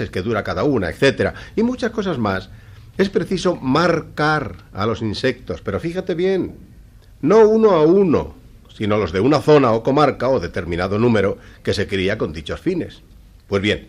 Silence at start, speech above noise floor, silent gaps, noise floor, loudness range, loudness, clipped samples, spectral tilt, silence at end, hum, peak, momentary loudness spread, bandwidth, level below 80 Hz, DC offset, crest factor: 0 s; 26 dB; none; -44 dBFS; 5 LU; -18 LUFS; under 0.1%; -6.5 dB/octave; 0.05 s; none; -2 dBFS; 11 LU; 12 kHz; -42 dBFS; under 0.1%; 16 dB